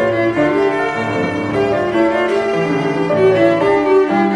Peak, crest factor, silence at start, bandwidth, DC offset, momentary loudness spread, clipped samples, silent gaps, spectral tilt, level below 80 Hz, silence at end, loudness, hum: -2 dBFS; 12 dB; 0 s; 10 kHz; under 0.1%; 5 LU; under 0.1%; none; -7 dB/octave; -48 dBFS; 0 s; -15 LUFS; none